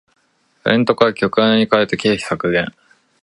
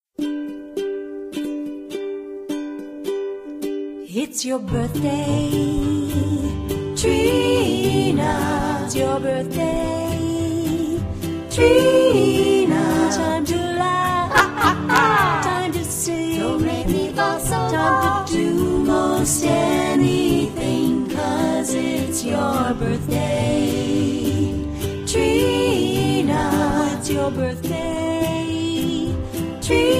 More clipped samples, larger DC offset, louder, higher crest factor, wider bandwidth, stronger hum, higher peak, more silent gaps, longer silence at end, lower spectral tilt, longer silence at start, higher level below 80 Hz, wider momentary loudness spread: neither; neither; first, -16 LUFS vs -20 LUFS; about the same, 18 dB vs 18 dB; second, 11.5 kHz vs 15.5 kHz; neither; about the same, 0 dBFS vs -2 dBFS; neither; first, 0.55 s vs 0 s; about the same, -5.5 dB/octave vs -5 dB/octave; first, 0.65 s vs 0.2 s; second, -52 dBFS vs -38 dBFS; second, 6 LU vs 11 LU